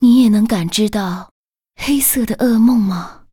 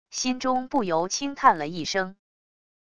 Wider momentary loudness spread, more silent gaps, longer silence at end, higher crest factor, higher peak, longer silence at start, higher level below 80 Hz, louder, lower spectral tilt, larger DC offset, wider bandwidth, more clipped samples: first, 13 LU vs 7 LU; first, 1.31-1.53 s vs none; second, 0.2 s vs 0.7 s; second, 12 dB vs 22 dB; about the same, -2 dBFS vs -4 dBFS; about the same, 0 s vs 0.05 s; first, -42 dBFS vs -60 dBFS; first, -15 LUFS vs -25 LUFS; first, -4.5 dB/octave vs -3 dB/octave; neither; first, 18.5 kHz vs 11 kHz; neither